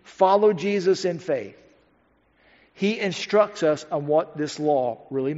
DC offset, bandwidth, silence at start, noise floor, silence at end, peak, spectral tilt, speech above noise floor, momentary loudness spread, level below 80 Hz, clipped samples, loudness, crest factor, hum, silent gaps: under 0.1%; 8 kHz; 0.1 s; -63 dBFS; 0 s; -6 dBFS; -4.5 dB/octave; 41 dB; 9 LU; -70 dBFS; under 0.1%; -23 LUFS; 18 dB; none; none